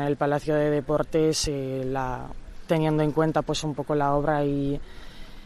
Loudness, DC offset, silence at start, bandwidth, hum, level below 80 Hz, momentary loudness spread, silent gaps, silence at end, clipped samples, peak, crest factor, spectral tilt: -25 LUFS; under 0.1%; 0 s; 13.5 kHz; none; -42 dBFS; 12 LU; none; 0 s; under 0.1%; -10 dBFS; 16 dB; -5.5 dB/octave